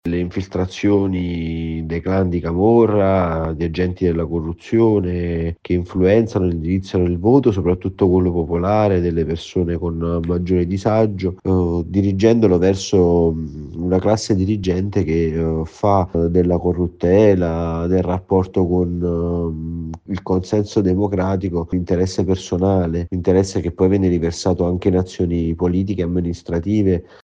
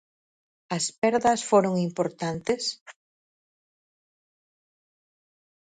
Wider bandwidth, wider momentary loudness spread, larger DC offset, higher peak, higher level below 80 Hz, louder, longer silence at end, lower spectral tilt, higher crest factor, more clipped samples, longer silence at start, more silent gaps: second, 9 kHz vs 10.5 kHz; about the same, 8 LU vs 9 LU; neither; first, 0 dBFS vs -8 dBFS; first, -36 dBFS vs -66 dBFS; first, -18 LUFS vs -25 LUFS; second, 0.2 s vs 2.85 s; first, -8 dB/octave vs -4.5 dB/octave; second, 16 dB vs 22 dB; neither; second, 0.05 s vs 0.7 s; second, none vs 0.98-1.02 s, 2.81-2.86 s